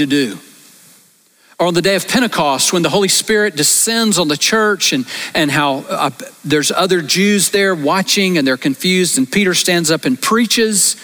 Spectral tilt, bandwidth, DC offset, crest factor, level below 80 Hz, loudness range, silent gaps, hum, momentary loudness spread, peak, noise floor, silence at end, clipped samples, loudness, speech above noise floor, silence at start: -3 dB/octave; over 20 kHz; under 0.1%; 12 dB; -54 dBFS; 2 LU; none; none; 6 LU; -2 dBFS; -51 dBFS; 0 s; under 0.1%; -13 LUFS; 37 dB; 0 s